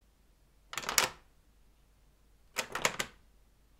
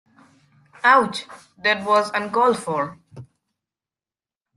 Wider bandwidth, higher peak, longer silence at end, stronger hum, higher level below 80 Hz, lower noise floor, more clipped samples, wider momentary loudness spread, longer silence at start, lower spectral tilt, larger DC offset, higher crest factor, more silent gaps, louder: first, 16 kHz vs 12.5 kHz; about the same, -2 dBFS vs -2 dBFS; second, 0.7 s vs 1.35 s; neither; first, -62 dBFS vs -68 dBFS; second, -66 dBFS vs under -90 dBFS; neither; second, 10 LU vs 13 LU; about the same, 0.75 s vs 0.85 s; second, -0.5 dB/octave vs -4 dB/octave; neither; first, 38 dB vs 20 dB; neither; second, -34 LUFS vs -20 LUFS